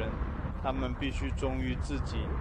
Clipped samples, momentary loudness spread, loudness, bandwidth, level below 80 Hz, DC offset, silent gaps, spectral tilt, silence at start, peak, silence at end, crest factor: under 0.1%; 3 LU; -34 LUFS; 9.6 kHz; -36 dBFS; under 0.1%; none; -6.5 dB/octave; 0 s; -18 dBFS; 0 s; 14 dB